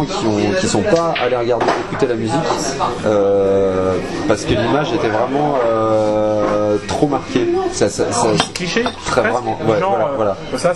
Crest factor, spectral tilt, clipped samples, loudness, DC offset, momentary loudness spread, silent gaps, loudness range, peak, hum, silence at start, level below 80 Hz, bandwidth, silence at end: 16 dB; -5 dB/octave; under 0.1%; -16 LUFS; under 0.1%; 4 LU; none; 1 LU; 0 dBFS; none; 0 s; -40 dBFS; 12 kHz; 0 s